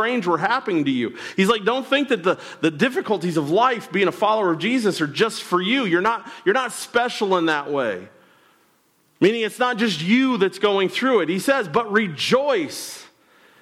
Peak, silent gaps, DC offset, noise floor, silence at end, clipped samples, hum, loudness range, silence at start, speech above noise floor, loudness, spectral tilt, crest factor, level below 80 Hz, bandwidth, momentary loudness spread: -6 dBFS; none; under 0.1%; -62 dBFS; 0.55 s; under 0.1%; none; 3 LU; 0 s; 41 dB; -20 LUFS; -4.5 dB/octave; 16 dB; -68 dBFS; 15.5 kHz; 5 LU